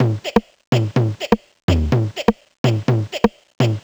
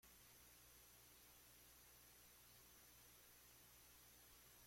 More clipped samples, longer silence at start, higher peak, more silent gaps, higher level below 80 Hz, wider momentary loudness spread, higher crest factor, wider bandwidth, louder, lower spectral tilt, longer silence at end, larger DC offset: neither; about the same, 0 s vs 0 s; first, 0 dBFS vs -56 dBFS; first, 0.67-0.72 s, 1.63-1.68 s, 2.58-2.64 s vs none; first, -34 dBFS vs -80 dBFS; first, 3 LU vs 0 LU; about the same, 18 dB vs 14 dB; first, over 20 kHz vs 16.5 kHz; first, -20 LUFS vs -66 LUFS; first, -7 dB/octave vs -1.5 dB/octave; about the same, 0 s vs 0 s; neither